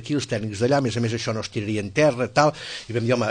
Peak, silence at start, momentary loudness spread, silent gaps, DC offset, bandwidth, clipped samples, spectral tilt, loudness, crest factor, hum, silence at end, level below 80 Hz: -4 dBFS; 0 s; 7 LU; none; under 0.1%; 9.8 kHz; under 0.1%; -5.5 dB/octave; -23 LUFS; 18 dB; none; 0 s; -56 dBFS